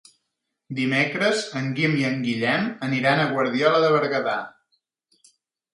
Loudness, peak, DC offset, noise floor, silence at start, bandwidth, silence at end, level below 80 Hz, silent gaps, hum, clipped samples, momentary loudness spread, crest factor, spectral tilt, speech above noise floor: -22 LUFS; -4 dBFS; under 0.1%; -79 dBFS; 0.7 s; 11.5 kHz; 1.25 s; -68 dBFS; none; none; under 0.1%; 8 LU; 20 dB; -5.5 dB/octave; 57 dB